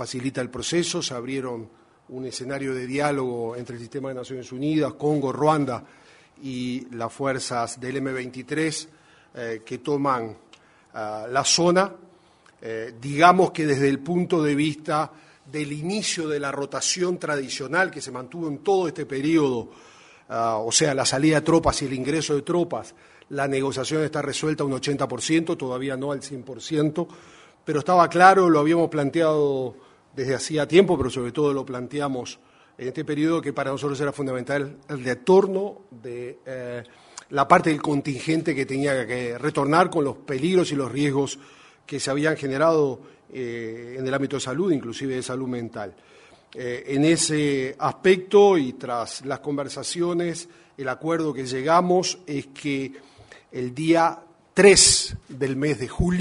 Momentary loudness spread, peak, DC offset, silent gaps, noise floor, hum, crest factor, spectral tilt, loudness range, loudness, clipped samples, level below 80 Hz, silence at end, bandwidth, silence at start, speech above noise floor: 16 LU; 0 dBFS; under 0.1%; none; -56 dBFS; none; 24 dB; -4 dB/octave; 8 LU; -23 LUFS; under 0.1%; -50 dBFS; 0 s; 11 kHz; 0 s; 33 dB